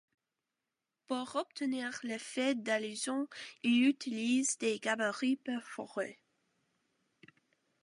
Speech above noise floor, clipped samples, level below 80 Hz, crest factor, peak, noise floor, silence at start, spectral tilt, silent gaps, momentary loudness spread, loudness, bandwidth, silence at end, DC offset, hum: 55 dB; under 0.1%; -88 dBFS; 18 dB; -18 dBFS; -89 dBFS; 1.1 s; -2.5 dB/octave; none; 10 LU; -35 LUFS; 11.5 kHz; 1.7 s; under 0.1%; none